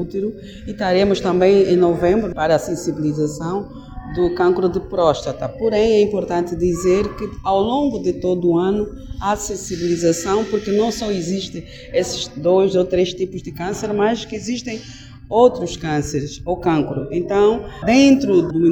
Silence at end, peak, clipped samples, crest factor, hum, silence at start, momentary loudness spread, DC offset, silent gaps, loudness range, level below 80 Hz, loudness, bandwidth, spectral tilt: 0 s; 0 dBFS; under 0.1%; 18 dB; none; 0 s; 11 LU; under 0.1%; none; 3 LU; -40 dBFS; -18 LUFS; 16.5 kHz; -5.5 dB/octave